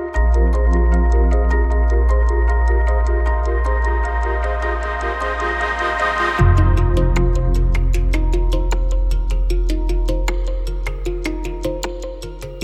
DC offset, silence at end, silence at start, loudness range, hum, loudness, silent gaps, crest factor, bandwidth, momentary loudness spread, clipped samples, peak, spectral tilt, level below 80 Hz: under 0.1%; 0 s; 0 s; 5 LU; none; -19 LUFS; none; 14 dB; 8.6 kHz; 9 LU; under 0.1%; -2 dBFS; -6.5 dB/octave; -16 dBFS